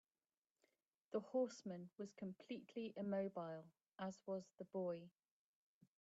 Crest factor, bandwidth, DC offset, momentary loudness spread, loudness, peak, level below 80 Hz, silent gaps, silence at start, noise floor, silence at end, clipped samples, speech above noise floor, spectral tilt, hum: 20 dB; 8 kHz; under 0.1%; 10 LU; -49 LUFS; -30 dBFS; under -90 dBFS; none; 1.1 s; under -90 dBFS; 0.9 s; under 0.1%; over 42 dB; -6.5 dB/octave; none